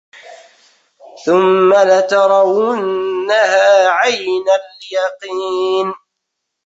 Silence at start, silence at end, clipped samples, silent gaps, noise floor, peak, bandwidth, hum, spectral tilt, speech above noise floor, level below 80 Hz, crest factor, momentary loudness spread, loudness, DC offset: 0.25 s; 0.7 s; under 0.1%; none; -75 dBFS; -2 dBFS; 8 kHz; none; -4 dB/octave; 63 dB; -64 dBFS; 12 dB; 10 LU; -13 LUFS; under 0.1%